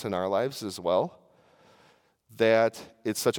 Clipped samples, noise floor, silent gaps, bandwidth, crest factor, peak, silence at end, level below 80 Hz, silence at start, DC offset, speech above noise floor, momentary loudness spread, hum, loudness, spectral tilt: under 0.1%; -63 dBFS; none; 18 kHz; 20 dB; -8 dBFS; 0 s; -76 dBFS; 0 s; under 0.1%; 36 dB; 11 LU; none; -27 LUFS; -4.5 dB/octave